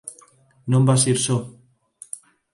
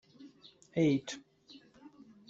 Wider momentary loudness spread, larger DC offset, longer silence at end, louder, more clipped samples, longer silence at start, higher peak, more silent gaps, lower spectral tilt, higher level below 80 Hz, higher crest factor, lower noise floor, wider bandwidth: second, 21 LU vs 26 LU; neither; first, 1.05 s vs 0.4 s; first, -19 LUFS vs -33 LUFS; neither; second, 0.05 s vs 0.2 s; first, -4 dBFS vs -18 dBFS; neither; second, -5 dB/octave vs -6.5 dB/octave; first, -60 dBFS vs -74 dBFS; about the same, 20 dB vs 20 dB; second, -54 dBFS vs -60 dBFS; first, 11.5 kHz vs 8 kHz